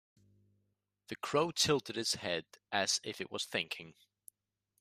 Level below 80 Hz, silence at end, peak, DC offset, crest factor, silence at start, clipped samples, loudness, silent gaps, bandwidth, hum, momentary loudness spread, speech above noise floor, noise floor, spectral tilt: -76 dBFS; 0.9 s; -16 dBFS; under 0.1%; 22 dB; 1.1 s; under 0.1%; -35 LUFS; none; 15.5 kHz; none; 13 LU; 47 dB; -83 dBFS; -2.5 dB/octave